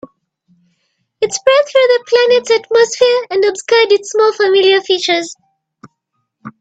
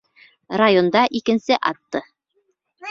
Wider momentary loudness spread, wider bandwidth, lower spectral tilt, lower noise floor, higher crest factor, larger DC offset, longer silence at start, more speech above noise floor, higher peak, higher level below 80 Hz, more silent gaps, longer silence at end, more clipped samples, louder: second, 5 LU vs 14 LU; first, 9 kHz vs 7.4 kHz; second, -1.5 dB/octave vs -5.5 dB/octave; about the same, -70 dBFS vs -69 dBFS; second, 14 dB vs 20 dB; neither; first, 1.2 s vs 0.5 s; first, 58 dB vs 50 dB; about the same, 0 dBFS vs -2 dBFS; about the same, -64 dBFS vs -62 dBFS; neither; about the same, 0.1 s vs 0 s; neither; first, -12 LUFS vs -19 LUFS